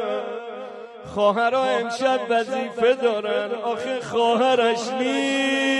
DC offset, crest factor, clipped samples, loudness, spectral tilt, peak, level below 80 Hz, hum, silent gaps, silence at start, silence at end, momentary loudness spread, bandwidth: under 0.1%; 14 dB; under 0.1%; -22 LUFS; -3.5 dB/octave; -8 dBFS; -64 dBFS; none; none; 0 s; 0 s; 13 LU; 11.5 kHz